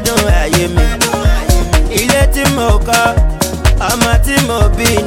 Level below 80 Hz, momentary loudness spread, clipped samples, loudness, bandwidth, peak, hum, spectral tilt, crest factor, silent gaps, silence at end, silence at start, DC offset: -14 dBFS; 3 LU; under 0.1%; -12 LUFS; 17 kHz; 0 dBFS; none; -4 dB/octave; 10 dB; none; 0 s; 0 s; under 0.1%